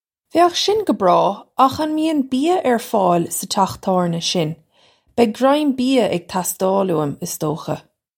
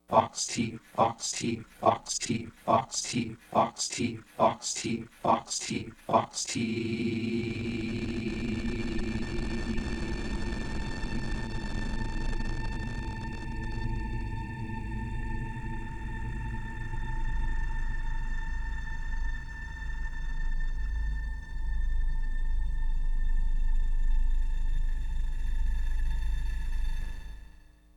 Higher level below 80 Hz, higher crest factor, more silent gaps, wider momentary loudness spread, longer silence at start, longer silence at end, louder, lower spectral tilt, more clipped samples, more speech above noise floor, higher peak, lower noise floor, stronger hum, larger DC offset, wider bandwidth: second, -58 dBFS vs -32 dBFS; about the same, 18 dB vs 22 dB; neither; about the same, 8 LU vs 10 LU; first, 0.35 s vs 0.1 s; about the same, 0.4 s vs 0.45 s; first, -18 LUFS vs -33 LUFS; about the same, -4.5 dB/octave vs -4.5 dB/octave; neither; first, 39 dB vs 22 dB; first, -2 dBFS vs -8 dBFS; about the same, -56 dBFS vs -53 dBFS; neither; neither; first, 17 kHz vs 11 kHz